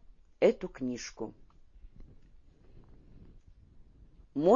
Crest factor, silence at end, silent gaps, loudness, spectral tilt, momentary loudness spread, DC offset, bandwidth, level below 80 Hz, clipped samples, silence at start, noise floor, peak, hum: 22 dB; 0 s; none; -33 LUFS; -5.5 dB/octave; 15 LU; under 0.1%; 7.2 kHz; -56 dBFS; under 0.1%; 0.4 s; -57 dBFS; -12 dBFS; none